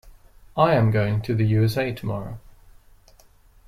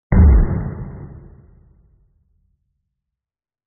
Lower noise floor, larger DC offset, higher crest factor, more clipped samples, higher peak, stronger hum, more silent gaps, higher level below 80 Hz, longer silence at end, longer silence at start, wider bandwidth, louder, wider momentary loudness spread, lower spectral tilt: second, -53 dBFS vs under -90 dBFS; neither; about the same, 18 dB vs 16 dB; neither; second, -6 dBFS vs -2 dBFS; neither; neither; second, -46 dBFS vs -20 dBFS; second, 1.3 s vs 2.55 s; about the same, 0.05 s vs 0.1 s; first, 14 kHz vs 2.3 kHz; second, -22 LUFS vs -16 LUFS; second, 15 LU vs 24 LU; about the same, -8 dB/octave vs -9 dB/octave